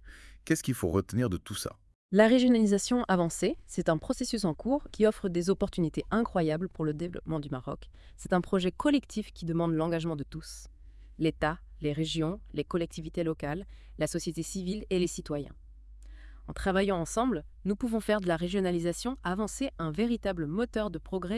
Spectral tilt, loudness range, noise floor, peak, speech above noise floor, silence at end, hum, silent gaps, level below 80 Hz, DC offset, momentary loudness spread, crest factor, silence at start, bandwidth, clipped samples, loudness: -5.5 dB/octave; 7 LU; -49 dBFS; -8 dBFS; 19 dB; 0 s; none; 1.95-2.09 s; -48 dBFS; under 0.1%; 10 LU; 22 dB; 0.05 s; 12 kHz; under 0.1%; -31 LUFS